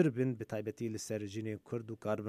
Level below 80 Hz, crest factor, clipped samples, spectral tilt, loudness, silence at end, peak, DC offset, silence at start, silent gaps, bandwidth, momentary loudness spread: -76 dBFS; 20 dB; under 0.1%; -6.5 dB/octave; -39 LUFS; 0 s; -16 dBFS; under 0.1%; 0 s; none; 15 kHz; 6 LU